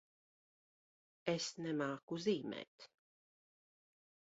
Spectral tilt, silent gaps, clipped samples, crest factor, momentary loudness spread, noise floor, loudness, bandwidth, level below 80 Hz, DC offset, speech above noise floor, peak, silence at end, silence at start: -4.5 dB/octave; 2.03-2.08 s, 2.67-2.78 s; under 0.1%; 24 dB; 18 LU; under -90 dBFS; -41 LUFS; 7.6 kHz; -86 dBFS; under 0.1%; over 49 dB; -20 dBFS; 1.5 s; 1.25 s